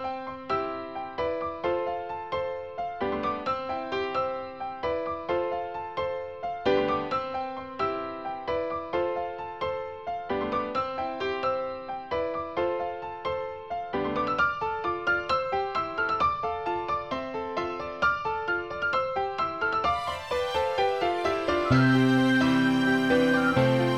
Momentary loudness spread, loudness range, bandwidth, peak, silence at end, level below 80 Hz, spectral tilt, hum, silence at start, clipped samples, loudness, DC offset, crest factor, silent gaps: 11 LU; 7 LU; 13 kHz; -10 dBFS; 0 s; -54 dBFS; -6.5 dB/octave; none; 0 s; under 0.1%; -28 LUFS; 0.1%; 18 dB; none